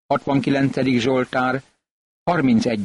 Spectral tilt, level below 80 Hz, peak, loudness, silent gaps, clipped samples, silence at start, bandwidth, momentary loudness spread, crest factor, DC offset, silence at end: -6.5 dB/octave; -54 dBFS; -8 dBFS; -20 LUFS; 1.91-2.26 s; under 0.1%; 0.1 s; 11 kHz; 6 LU; 12 dB; under 0.1%; 0 s